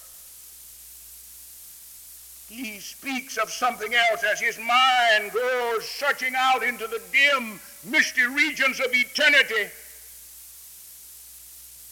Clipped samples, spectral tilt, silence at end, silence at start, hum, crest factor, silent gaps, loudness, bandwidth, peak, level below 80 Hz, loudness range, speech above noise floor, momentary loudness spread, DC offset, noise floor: under 0.1%; -0.5 dB/octave; 0 s; 0 s; 60 Hz at -65 dBFS; 20 dB; none; -21 LUFS; over 20 kHz; -6 dBFS; -64 dBFS; 11 LU; 22 dB; 23 LU; under 0.1%; -45 dBFS